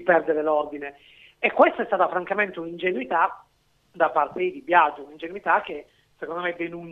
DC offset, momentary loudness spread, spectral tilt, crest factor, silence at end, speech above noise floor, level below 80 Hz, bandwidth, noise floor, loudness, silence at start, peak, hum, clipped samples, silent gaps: under 0.1%; 17 LU; -7 dB/octave; 22 dB; 0 s; 38 dB; -66 dBFS; 6.6 kHz; -62 dBFS; -23 LUFS; 0 s; -2 dBFS; none; under 0.1%; none